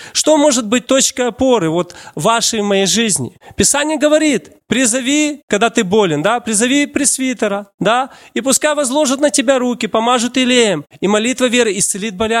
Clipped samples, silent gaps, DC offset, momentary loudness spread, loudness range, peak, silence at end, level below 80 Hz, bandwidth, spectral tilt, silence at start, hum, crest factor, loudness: under 0.1%; 5.43-5.48 s, 7.74-7.78 s; under 0.1%; 6 LU; 1 LU; 0 dBFS; 0 s; -50 dBFS; 16.5 kHz; -3 dB/octave; 0 s; none; 14 dB; -14 LUFS